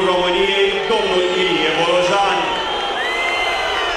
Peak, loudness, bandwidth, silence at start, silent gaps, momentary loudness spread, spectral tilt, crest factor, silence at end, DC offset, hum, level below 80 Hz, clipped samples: -2 dBFS; -16 LUFS; 13 kHz; 0 s; none; 4 LU; -3 dB/octave; 14 dB; 0 s; under 0.1%; none; -44 dBFS; under 0.1%